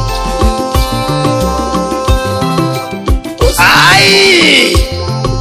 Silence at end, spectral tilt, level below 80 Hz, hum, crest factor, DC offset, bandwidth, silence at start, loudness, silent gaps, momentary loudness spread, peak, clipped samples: 0 s; -4 dB/octave; -18 dBFS; none; 10 dB; under 0.1%; 16 kHz; 0 s; -9 LUFS; none; 12 LU; 0 dBFS; 0.4%